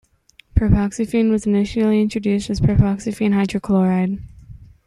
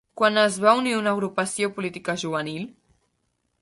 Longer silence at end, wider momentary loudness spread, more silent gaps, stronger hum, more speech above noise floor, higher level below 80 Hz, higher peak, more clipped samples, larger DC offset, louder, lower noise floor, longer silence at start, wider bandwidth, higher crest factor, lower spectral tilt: second, 0.2 s vs 0.95 s; second, 4 LU vs 12 LU; neither; neither; second, 35 dB vs 50 dB; first, -32 dBFS vs -68 dBFS; about the same, -2 dBFS vs -4 dBFS; neither; neither; first, -19 LUFS vs -23 LUFS; second, -53 dBFS vs -73 dBFS; first, 0.55 s vs 0.15 s; about the same, 11.5 kHz vs 11.5 kHz; about the same, 16 dB vs 20 dB; first, -7.5 dB/octave vs -4 dB/octave